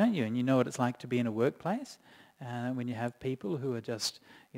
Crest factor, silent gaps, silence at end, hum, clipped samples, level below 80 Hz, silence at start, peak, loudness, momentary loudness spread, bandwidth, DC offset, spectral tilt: 20 dB; none; 0 s; none; under 0.1%; -72 dBFS; 0 s; -14 dBFS; -33 LUFS; 10 LU; 16 kHz; under 0.1%; -5.5 dB/octave